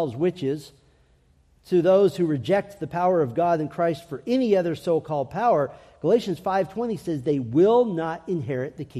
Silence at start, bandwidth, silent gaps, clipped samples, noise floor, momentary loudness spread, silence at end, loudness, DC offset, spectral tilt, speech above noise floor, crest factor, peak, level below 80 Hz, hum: 0 s; 13.5 kHz; none; under 0.1%; -60 dBFS; 10 LU; 0 s; -24 LUFS; under 0.1%; -7.5 dB/octave; 37 dB; 14 dB; -8 dBFS; -60 dBFS; none